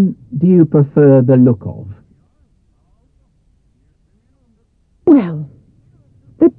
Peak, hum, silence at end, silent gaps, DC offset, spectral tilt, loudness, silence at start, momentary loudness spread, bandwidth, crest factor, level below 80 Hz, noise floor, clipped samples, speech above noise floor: 0 dBFS; none; 0.1 s; none; under 0.1%; -13.5 dB/octave; -12 LUFS; 0 s; 20 LU; 3.8 kHz; 14 dB; -52 dBFS; -57 dBFS; under 0.1%; 47 dB